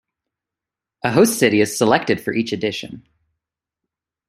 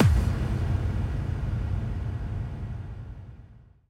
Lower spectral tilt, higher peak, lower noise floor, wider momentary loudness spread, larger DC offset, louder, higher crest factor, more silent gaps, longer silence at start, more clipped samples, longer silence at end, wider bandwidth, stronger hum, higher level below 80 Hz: second, -4.5 dB/octave vs -7.5 dB/octave; first, -2 dBFS vs -8 dBFS; first, -87 dBFS vs -50 dBFS; second, 11 LU vs 15 LU; neither; first, -18 LUFS vs -30 LUFS; about the same, 20 dB vs 18 dB; neither; first, 1.05 s vs 0 s; neither; first, 1.3 s vs 0.3 s; first, 15.5 kHz vs 13 kHz; neither; second, -60 dBFS vs -32 dBFS